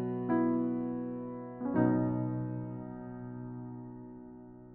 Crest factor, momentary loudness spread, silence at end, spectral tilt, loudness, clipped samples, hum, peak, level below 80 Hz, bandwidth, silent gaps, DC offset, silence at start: 18 dB; 18 LU; 0 s; -10.5 dB/octave; -34 LUFS; under 0.1%; none; -16 dBFS; -62 dBFS; 3.1 kHz; none; under 0.1%; 0 s